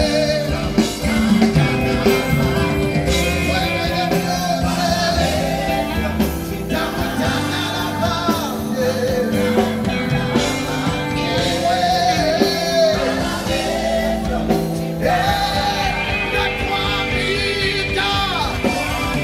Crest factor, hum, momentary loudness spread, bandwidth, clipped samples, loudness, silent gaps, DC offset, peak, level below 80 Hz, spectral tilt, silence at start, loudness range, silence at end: 16 dB; none; 4 LU; 16 kHz; under 0.1%; -18 LUFS; none; under 0.1%; -2 dBFS; -32 dBFS; -5 dB/octave; 0 s; 2 LU; 0 s